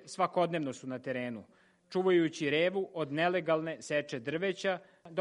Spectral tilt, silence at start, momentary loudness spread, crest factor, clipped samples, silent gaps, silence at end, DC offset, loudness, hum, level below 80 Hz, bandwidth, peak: -5.5 dB/octave; 0 s; 10 LU; 18 dB; under 0.1%; none; 0 s; under 0.1%; -33 LUFS; none; -80 dBFS; 11 kHz; -14 dBFS